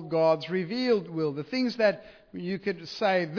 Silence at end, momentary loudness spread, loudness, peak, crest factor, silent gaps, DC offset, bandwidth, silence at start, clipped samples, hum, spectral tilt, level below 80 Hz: 0 s; 10 LU; -28 LUFS; -12 dBFS; 16 dB; none; under 0.1%; 5.4 kHz; 0 s; under 0.1%; none; -6.5 dB/octave; -70 dBFS